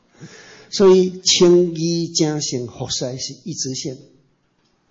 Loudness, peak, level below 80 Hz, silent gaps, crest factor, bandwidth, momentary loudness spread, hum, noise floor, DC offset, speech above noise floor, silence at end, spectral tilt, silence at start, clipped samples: -17 LUFS; -4 dBFS; -58 dBFS; none; 14 dB; 8 kHz; 15 LU; none; -63 dBFS; under 0.1%; 46 dB; 0.95 s; -4.5 dB/octave; 0.2 s; under 0.1%